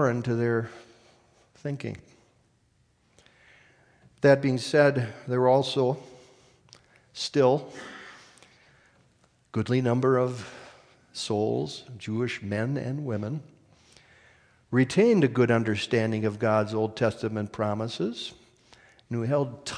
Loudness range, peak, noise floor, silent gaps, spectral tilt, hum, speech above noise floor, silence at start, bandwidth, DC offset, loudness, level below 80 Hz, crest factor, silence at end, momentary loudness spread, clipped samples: 7 LU; -6 dBFS; -67 dBFS; none; -6.5 dB/octave; none; 41 dB; 0 s; 10.5 kHz; under 0.1%; -26 LUFS; -68 dBFS; 20 dB; 0 s; 17 LU; under 0.1%